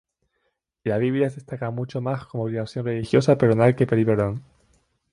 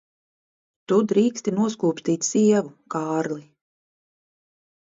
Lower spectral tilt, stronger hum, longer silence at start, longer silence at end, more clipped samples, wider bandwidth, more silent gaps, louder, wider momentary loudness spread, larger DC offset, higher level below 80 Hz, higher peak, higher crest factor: first, -8 dB/octave vs -5.5 dB/octave; neither; about the same, 0.85 s vs 0.9 s; second, 0.7 s vs 1.45 s; neither; first, 11 kHz vs 7.8 kHz; neither; about the same, -23 LUFS vs -22 LUFS; about the same, 11 LU vs 11 LU; neither; first, -54 dBFS vs -70 dBFS; first, -4 dBFS vs -8 dBFS; about the same, 18 dB vs 18 dB